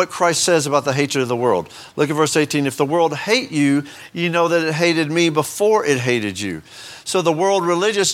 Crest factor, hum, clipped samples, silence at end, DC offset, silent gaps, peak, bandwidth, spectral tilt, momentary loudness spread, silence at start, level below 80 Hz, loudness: 16 dB; none; under 0.1%; 0 s; under 0.1%; none; -2 dBFS; 17 kHz; -4 dB/octave; 7 LU; 0 s; -62 dBFS; -18 LUFS